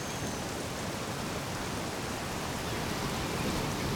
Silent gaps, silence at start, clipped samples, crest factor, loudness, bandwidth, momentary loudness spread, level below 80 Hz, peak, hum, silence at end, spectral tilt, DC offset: none; 0 s; under 0.1%; 14 dB; -34 LUFS; over 20 kHz; 3 LU; -48 dBFS; -20 dBFS; none; 0 s; -4 dB/octave; under 0.1%